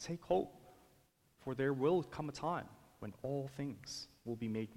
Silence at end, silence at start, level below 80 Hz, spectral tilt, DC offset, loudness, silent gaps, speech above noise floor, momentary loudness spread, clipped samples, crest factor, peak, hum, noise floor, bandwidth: 0 s; 0 s; -68 dBFS; -6 dB/octave; under 0.1%; -40 LUFS; none; 32 dB; 14 LU; under 0.1%; 18 dB; -22 dBFS; none; -72 dBFS; 16.5 kHz